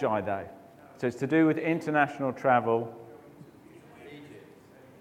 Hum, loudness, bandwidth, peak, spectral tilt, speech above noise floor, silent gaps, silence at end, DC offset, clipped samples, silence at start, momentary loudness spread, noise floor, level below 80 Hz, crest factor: none; -27 LUFS; 10 kHz; -8 dBFS; -7.5 dB/octave; 26 dB; none; 0.6 s; under 0.1%; under 0.1%; 0 s; 24 LU; -53 dBFS; -72 dBFS; 22 dB